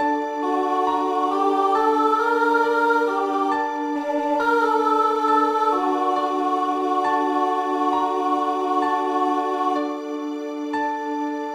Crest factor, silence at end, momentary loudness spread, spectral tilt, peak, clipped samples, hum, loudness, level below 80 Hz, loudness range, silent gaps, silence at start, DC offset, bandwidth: 14 dB; 0 s; 6 LU; -3.5 dB/octave; -6 dBFS; under 0.1%; none; -21 LUFS; -66 dBFS; 3 LU; none; 0 s; under 0.1%; 14.5 kHz